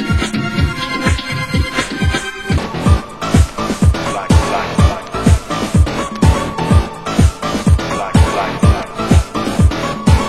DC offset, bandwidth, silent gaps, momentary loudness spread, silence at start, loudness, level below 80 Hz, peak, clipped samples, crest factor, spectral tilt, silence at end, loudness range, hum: 0.8%; 12.5 kHz; none; 4 LU; 0 s; -15 LUFS; -18 dBFS; 0 dBFS; under 0.1%; 14 dB; -6 dB/octave; 0 s; 2 LU; none